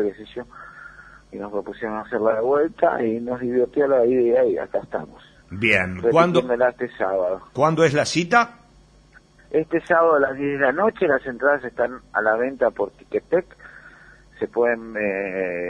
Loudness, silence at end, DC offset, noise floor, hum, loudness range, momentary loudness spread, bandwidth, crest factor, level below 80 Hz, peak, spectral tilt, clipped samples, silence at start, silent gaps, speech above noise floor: -21 LUFS; 0 s; under 0.1%; -52 dBFS; none; 4 LU; 13 LU; 10 kHz; 18 dB; -56 dBFS; -2 dBFS; -5.5 dB/octave; under 0.1%; 0 s; none; 31 dB